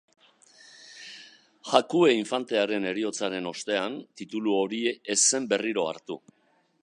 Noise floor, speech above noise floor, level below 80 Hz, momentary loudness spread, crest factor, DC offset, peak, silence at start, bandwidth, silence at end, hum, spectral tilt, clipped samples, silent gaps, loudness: -56 dBFS; 30 dB; -80 dBFS; 21 LU; 26 dB; under 0.1%; -2 dBFS; 0.8 s; 11 kHz; 0.65 s; none; -2.5 dB/octave; under 0.1%; none; -26 LUFS